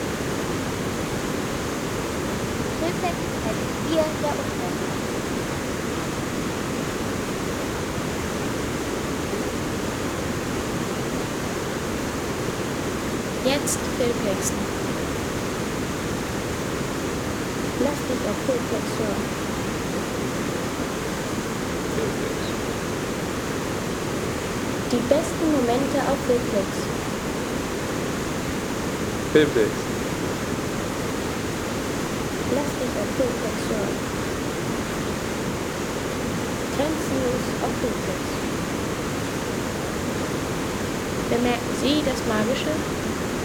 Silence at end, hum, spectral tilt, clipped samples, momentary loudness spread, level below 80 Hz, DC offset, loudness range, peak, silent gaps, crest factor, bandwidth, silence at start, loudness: 0 s; none; -4.5 dB/octave; under 0.1%; 5 LU; -42 dBFS; under 0.1%; 3 LU; -4 dBFS; none; 20 dB; over 20 kHz; 0 s; -25 LUFS